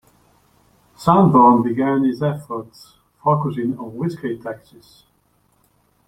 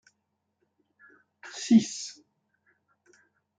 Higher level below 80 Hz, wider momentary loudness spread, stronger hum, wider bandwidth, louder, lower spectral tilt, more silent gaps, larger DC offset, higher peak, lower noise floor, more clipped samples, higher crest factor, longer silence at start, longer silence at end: first, -56 dBFS vs -76 dBFS; second, 18 LU vs 21 LU; neither; first, 14 kHz vs 9.4 kHz; first, -18 LUFS vs -25 LUFS; first, -9 dB/octave vs -4.5 dB/octave; neither; neither; first, -2 dBFS vs -10 dBFS; second, -62 dBFS vs -79 dBFS; neither; about the same, 18 dB vs 22 dB; second, 1 s vs 1.45 s; about the same, 1.5 s vs 1.45 s